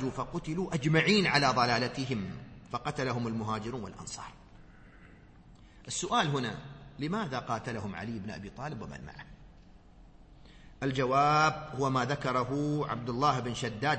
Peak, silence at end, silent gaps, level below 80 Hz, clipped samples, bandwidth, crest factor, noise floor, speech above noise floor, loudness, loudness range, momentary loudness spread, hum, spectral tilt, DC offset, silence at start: -12 dBFS; 0 s; none; -56 dBFS; under 0.1%; 8.4 kHz; 20 dB; -55 dBFS; 24 dB; -31 LUFS; 10 LU; 17 LU; none; -5 dB/octave; under 0.1%; 0 s